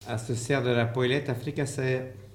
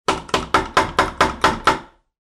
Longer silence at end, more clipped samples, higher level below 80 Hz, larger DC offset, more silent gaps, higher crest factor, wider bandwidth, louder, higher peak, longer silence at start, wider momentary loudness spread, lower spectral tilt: second, 0 s vs 0.4 s; neither; second, -60 dBFS vs -38 dBFS; neither; neither; about the same, 18 dB vs 16 dB; about the same, 15.5 kHz vs 15 kHz; second, -28 LUFS vs -19 LUFS; second, -10 dBFS vs -4 dBFS; about the same, 0 s vs 0.1 s; first, 7 LU vs 4 LU; first, -5.5 dB/octave vs -3.5 dB/octave